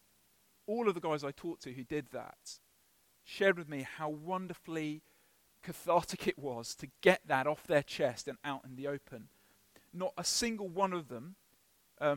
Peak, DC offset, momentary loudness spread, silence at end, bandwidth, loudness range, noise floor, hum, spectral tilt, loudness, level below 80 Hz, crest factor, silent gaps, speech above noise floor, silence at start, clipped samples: -12 dBFS; under 0.1%; 17 LU; 0 s; 17.5 kHz; 5 LU; -71 dBFS; none; -4 dB/octave; -36 LUFS; -70 dBFS; 26 dB; none; 35 dB; 0.7 s; under 0.1%